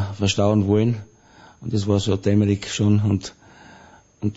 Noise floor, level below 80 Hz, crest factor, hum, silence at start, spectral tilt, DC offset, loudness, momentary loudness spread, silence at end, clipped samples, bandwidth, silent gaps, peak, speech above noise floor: -49 dBFS; -52 dBFS; 16 dB; none; 0 s; -6.5 dB/octave; under 0.1%; -21 LUFS; 11 LU; 0 s; under 0.1%; 8 kHz; none; -6 dBFS; 29 dB